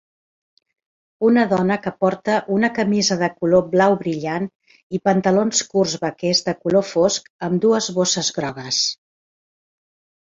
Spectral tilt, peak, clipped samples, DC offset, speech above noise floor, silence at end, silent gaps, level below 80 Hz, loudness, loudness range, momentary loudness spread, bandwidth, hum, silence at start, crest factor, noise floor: -4 dB/octave; -2 dBFS; under 0.1%; under 0.1%; over 71 dB; 1.35 s; 4.55-4.60 s, 4.83-4.90 s, 7.30-7.39 s; -60 dBFS; -19 LUFS; 2 LU; 7 LU; 8 kHz; none; 1.2 s; 18 dB; under -90 dBFS